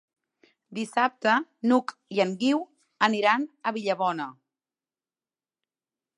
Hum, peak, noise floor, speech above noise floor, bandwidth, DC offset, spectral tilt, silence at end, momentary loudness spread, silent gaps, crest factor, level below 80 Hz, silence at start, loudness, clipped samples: none; -6 dBFS; under -90 dBFS; over 65 dB; 11.5 kHz; under 0.1%; -5 dB/octave; 1.85 s; 12 LU; none; 22 dB; -82 dBFS; 0.7 s; -26 LUFS; under 0.1%